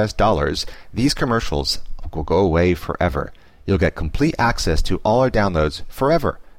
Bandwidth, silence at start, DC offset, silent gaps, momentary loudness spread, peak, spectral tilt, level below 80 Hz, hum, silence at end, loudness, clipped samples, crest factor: 16 kHz; 0 s; 0.9%; none; 9 LU; -6 dBFS; -5.5 dB/octave; -28 dBFS; none; 0.15 s; -20 LUFS; under 0.1%; 14 dB